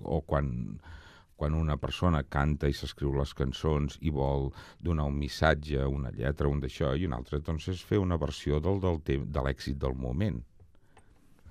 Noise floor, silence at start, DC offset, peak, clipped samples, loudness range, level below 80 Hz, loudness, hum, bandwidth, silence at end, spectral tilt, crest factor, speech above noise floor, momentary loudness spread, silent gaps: -58 dBFS; 0 s; under 0.1%; -10 dBFS; under 0.1%; 1 LU; -40 dBFS; -31 LUFS; none; 13.5 kHz; 0 s; -7 dB/octave; 22 dB; 28 dB; 7 LU; none